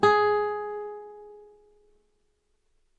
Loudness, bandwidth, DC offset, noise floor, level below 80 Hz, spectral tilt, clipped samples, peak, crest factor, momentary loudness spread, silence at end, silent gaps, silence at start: -26 LUFS; 8 kHz; under 0.1%; -71 dBFS; -66 dBFS; -5 dB/octave; under 0.1%; -6 dBFS; 22 dB; 25 LU; 1.6 s; none; 0 s